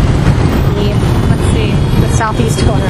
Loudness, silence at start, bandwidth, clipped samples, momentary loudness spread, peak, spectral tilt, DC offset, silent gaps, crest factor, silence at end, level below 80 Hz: -12 LUFS; 0 s; 14.5 kHz; 0.3%; 1 LU; 0 dBFS; -6.5 dB/octave; under 0.1%; none; 10 dB; 0 s; -18 dBFS